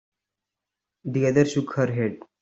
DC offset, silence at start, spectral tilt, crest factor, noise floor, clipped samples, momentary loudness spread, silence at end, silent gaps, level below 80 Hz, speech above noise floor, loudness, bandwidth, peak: under 0.1%; 1.05 s; -7 dB/octave; 20 dB; -86 dBFS; under 0.1%; 9 LU; 0.25 s; none; -64 dBFS; 63 dB; -24 LUFS; 8 kHz; -6 dBFS